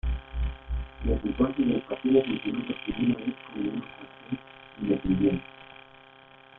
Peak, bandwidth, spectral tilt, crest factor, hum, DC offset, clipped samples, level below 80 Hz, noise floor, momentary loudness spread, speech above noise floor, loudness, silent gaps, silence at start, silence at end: -10 dBFS; 4 kHz; -10.5 dB/octave; 18 dB; none; under 0.1%; under 0.1%; -38 dBFS; -53 dBFS; 20 LU; 26 dB; -29 LUFS; none; 0.05 s; 0.8 s